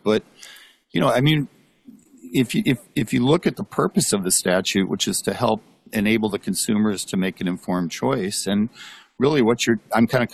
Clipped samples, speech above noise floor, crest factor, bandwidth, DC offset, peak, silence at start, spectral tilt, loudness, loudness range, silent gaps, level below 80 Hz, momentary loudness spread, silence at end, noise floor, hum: under 0.1%; 28 dB; 16 dB; 14.5 kHz; under 0.1%; -6 dBFS; 0.05 s; -4.5 dB/octave; -21 LUFS; 2 LU; none; -54 dBFS; 8 LU; 0.05 s; -49 dBFS; none